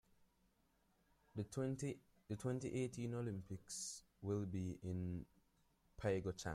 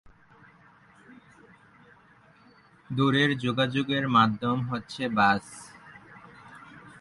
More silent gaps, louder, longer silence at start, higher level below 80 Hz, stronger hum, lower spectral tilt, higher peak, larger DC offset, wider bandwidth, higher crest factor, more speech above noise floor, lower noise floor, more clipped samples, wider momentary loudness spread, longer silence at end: neither; second, -46 LUFS vs -25 LUFS; second, 1.35 s vs 2.9 s; second, -70 dBFS vs -62 dBFS; neither; about the same, -6 dB/octave vs -6 dB/octave; second, -28 dBFS vs -8 dBFS; neither; first, 14.5 kHz vs 11.5 kHz; about the same, 18 dB vs 22 dB; about the same, 35 dB vs 32 dB; first, -79 dBFS vs -58 dBFS; neither; second, 8 LU vs 26 LU; about the same, 0 s vs 0.1 s